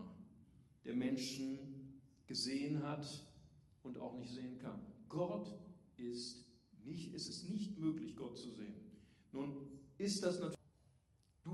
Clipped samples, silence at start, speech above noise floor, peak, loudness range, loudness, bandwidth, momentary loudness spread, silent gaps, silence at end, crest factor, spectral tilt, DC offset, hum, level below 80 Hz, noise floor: under 0.1%; 0 s; 30 dB; -26 dBFS; 4 LU; -45 LUFS; 12.5 kHz; 18 LU; none; 0 s; 20 dB; -5 dB/octave; under 0.1%; none; -76 dBFS; -74 dBFS